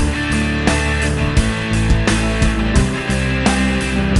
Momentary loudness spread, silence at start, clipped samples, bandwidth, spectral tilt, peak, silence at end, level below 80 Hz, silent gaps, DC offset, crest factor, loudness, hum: 2 LU; 0 s; under 0.1%; 11.5 kHz; -5 dB/octave; -2 dBFS; 0 s; -20 dBFS; none; under 0.1%; 14 dB; -17 LUFS; none